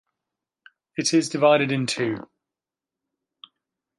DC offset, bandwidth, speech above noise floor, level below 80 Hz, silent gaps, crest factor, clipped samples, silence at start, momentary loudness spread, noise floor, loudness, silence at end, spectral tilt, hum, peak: under 0.1%; 11.5 kHz; 68 dB; -72 dBFS; none; 20 dB; under 0.1%; 1 s; 13 LU; -89 dBFS; -22 LUFS; 1.8 s; -4.5 dB/octave; none; -6 dBFS